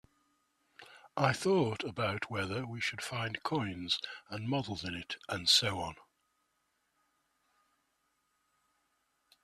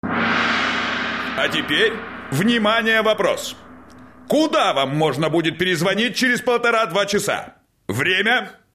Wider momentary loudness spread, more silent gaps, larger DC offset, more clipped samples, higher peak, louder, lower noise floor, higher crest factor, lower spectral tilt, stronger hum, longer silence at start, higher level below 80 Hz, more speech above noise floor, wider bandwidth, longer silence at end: first, 14 LU vs 8 LU; neither; neither; neither; second, -14 dBFS vs -6 dBFS; second, -33 LUFS vs -19 LUFS; first, -79 dBFS vs -43 dBFS; first, 24 dB vs 14 dB; about the same, -4 dB/octave vs -4 dB/octave; neither; first, 0.8 s vs 0.05 s; second, -70 dBFS vs -54 dBFS; first, 45 dB vs 25 dB; about the same, 14.5 kHz vs 15.5 kHz; first, 3.45 s vs 0.2 s